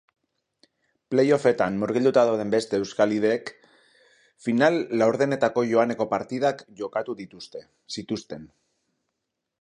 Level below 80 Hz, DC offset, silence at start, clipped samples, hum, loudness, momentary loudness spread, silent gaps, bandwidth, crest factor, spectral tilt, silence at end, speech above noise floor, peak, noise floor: -66 dBFS; under 0.1%; 1.1 s; under 0.1%; none; -24 LUFS; 16 LU; none; 11 kHz; 22 dB; -6 dB/octave; 1.15 s; 58 dB; -4 dBFS; -82 dBFS